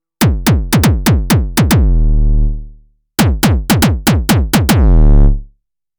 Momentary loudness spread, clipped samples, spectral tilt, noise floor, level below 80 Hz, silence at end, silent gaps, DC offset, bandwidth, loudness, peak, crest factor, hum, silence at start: 6 LU; under 0.1%; -5.5 dB/octave; -54 dBFS; -14 dBFS; 0.55 s; none; under 0.1%; over 20 kHz; -12 LUFS; -2 dBFS; 10 dB; none; 0.2 s